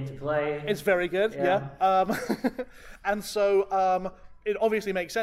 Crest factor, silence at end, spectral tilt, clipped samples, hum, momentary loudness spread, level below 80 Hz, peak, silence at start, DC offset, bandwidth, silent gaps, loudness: 14 dB; 0 s; -5 dB/octave; under 0.1%; none; 9 LU; -54 dBFS; -12 dBFS; 0 s; under 0.1%; 16 kHz; none; -27 LUFS